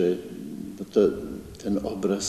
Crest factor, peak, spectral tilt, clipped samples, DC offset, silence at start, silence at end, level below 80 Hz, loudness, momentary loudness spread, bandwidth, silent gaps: 20 dB; -8 dBFS; -5.5 dB/octave; under 0.1%; under 0.1%; 0 s; 0 s; -52 dBFS; -27 LUFS; 14 LU; 13 kHz; none